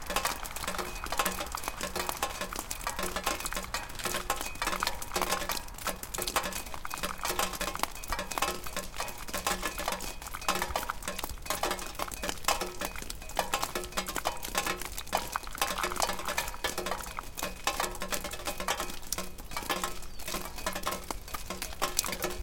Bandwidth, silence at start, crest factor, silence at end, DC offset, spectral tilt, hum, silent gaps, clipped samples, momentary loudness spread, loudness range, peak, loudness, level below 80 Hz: 17 kHz; 0 s; 30 dB; 0 s; under 0.1%; -1.5 dB/octave; none; none; under 0.1%; 7 LU; 2 LU; -4 dBFS; -34 LUFS; -46 dBFS